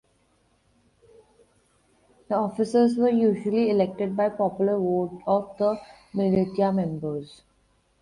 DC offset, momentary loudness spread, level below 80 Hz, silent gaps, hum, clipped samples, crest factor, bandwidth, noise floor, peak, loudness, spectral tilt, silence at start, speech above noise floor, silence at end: under 0.1%; 10 LU; -62 dBFS; none; none; under 0.1%; 16 dB; 11 kHz; -66 dBFS; -10 dBFS; -24 LUFS; -8.5 dB/octave; 2.3 s; 42 dB; 0.75 s